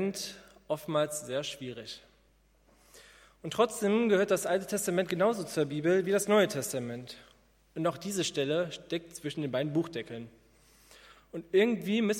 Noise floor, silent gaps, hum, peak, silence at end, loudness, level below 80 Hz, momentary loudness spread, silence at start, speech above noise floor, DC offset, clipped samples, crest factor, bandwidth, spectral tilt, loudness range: -66 dBFS; none; none; -12 dBFS; 0 s; -31 LUFS; -68 dBFS; 18 LU; 0 s; 35 dB; under 0.1%; under 0.1%; 20 dB; 16.5 kHz; -4.5 dB/octave; 7 LU